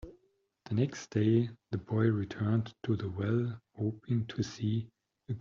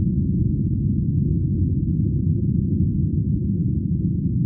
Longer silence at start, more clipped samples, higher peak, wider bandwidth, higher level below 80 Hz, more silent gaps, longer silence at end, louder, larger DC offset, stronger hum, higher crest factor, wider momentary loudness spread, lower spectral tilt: about the same, 0.05 s vs 0 s; neither; second, -16 dBFS vs -10 dBFS; first, 7.4 kHz vs 0.6 kHz; second, -64 dBFS vs -30 dBFS; neither; about the same, 0 s vs 0 s; second, -33 LUFS vs -22 LUFS; neither; neither; first, 16 dB vs 10 dB; first, 9 LU vs 1 LU; second, -8 dB/octave vs -27 dB/octave